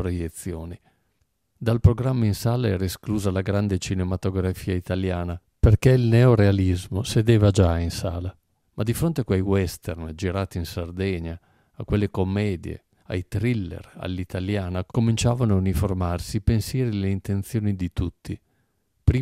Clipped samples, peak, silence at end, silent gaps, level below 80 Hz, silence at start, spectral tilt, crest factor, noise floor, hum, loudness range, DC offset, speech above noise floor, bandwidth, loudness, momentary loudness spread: under 0.1%; -2 dBFS; 0 s; none; -38 dBFS; 0 s; -7 dB/octave; 20 dB; -71 dBFS; none; 8 LU; under 0.1%; 48 dB; 15.5 kHz; -24 LUFS; 15 LU